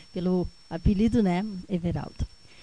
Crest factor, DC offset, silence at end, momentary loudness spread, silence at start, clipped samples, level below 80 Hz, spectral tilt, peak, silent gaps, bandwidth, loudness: 14 dB; 0.2%; 0.35 s; 13 LU; 0.15 s; under 0.1%; -38 dBFS; -8 dB/octave; -12 dBFS; none; 10 kHz; -27 LUFS